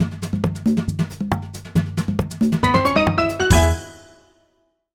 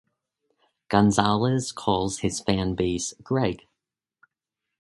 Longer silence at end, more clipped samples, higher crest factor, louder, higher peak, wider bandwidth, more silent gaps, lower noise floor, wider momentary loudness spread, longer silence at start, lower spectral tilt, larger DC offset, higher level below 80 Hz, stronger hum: second, 0.95 s vs 1.25 s; neither; second, 18 dB vs 26 dB; first, -20 LUFS vs -24 LUFS; about the same, -2 dBFS vs 0 dBFS; first, 18 kHz vs 11.5 kHz; neither; second, -65 dBFS vs -85 dBFS; about the same, 9 LU vs 7 LU; second, 0 s vs 0.9 s; about the same, -5.5 dB/octave vs -5 dB/octave; neither; first, -32 dBFS vs -48 dBFS; neither